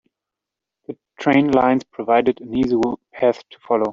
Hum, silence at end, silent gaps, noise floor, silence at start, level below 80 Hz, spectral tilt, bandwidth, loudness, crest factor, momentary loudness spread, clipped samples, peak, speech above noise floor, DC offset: none; 0 s; none; -85 dBFS; 0.9 s; -52 dBFS; -7 dB/octave; 7.4 kHz; -19 LUFS; 16 dB; 16 LU; under 0.1%; -2 dBFS; 67 dB; under 0.1%